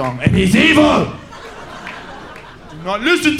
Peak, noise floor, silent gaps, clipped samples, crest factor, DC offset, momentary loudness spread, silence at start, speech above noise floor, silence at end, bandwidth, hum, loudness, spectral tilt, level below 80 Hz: 0 dBFS; -35 dBFS; none; under 0.1%; 16 dB; under 0.1%; 23 LU; 0 s; 22 dB; 0 s; 15.5 kHz; none; -13 LUFS; -5 dB/octave; -36 dBFS